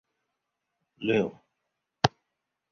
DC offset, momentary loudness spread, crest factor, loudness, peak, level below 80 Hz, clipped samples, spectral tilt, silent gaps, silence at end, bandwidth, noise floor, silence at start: under 0.1%; 8 LU; 30 dB; -29 LUFS; -2 dBFS; -60 dBFS; under 0.1%; -5.5 dB/octave; none; 0.65 s; 7.4 kHz; -83 dBFS; 1 s